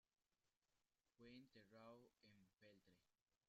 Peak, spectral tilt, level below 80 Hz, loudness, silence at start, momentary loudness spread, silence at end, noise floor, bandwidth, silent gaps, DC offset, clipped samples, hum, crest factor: -52 dBFS; -4 dB/octave; under -90 dBFS; -67 LUFS; 0.45 s; 3 LU; 0.1 s; under -90 dBFS; 7.2 kHz; 0.57-0.61 s, 3.22-3.26 s; under 0.1%; under 0.1%; none; 18 dB